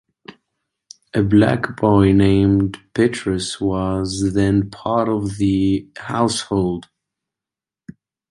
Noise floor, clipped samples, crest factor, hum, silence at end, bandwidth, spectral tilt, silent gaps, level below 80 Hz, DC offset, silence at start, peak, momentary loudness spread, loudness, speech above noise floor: -89 dBFS; under 0.1%; 16 dB; none; 1.5 s; 11.5 kHz; -6.5 dB/octave; none; -40 dBFS; under 0.1%; 0.3 s; -2 dBFS; 8 LU; -18 LUFS; 71 dB